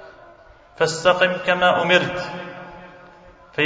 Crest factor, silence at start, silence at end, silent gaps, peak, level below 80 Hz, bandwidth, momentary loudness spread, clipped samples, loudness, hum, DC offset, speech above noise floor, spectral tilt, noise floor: 20 dB; 0 s; 0 s; none; -2 dBFS; -56 dBFS; 8 kHz; 18 LU; under 0.1%; -19 LUFS; none; under 0.1%; 29 dB; -4 dB/octave; -48 dBFS